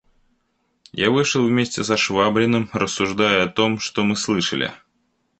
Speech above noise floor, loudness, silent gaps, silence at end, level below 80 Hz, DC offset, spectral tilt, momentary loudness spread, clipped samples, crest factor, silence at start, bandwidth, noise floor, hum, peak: 49 dB; -19 LUFS; none; 0.65 s; -54 dBFS; under 0.1%; -4 dB/octave; 5 LU; under 0.1%; 18 dB; 0.95 s; 8.8 kHz; -69 dBFS; none; -2 dBFS